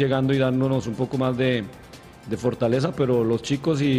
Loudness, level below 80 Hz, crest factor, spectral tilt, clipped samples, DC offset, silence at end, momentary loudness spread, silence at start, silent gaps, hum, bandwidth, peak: -23 LUFS; -52 dBFS; 14 dB; -7 dB/octave; under 0.1%; under 0.1%; 0 s; 10 LU; 0 s; none; none; 12 kHz; -10 dBFS